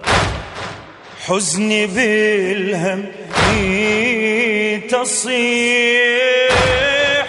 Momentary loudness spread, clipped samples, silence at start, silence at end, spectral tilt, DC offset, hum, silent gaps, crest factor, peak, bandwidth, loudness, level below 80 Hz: 10 LU; under 0.1%; 0 s; 0 s; -3 dB/octave; under 0.1%; none; none; 16 dB; 0 dBFS; 11.5 kHz; -15 LUFS; -36 dBFS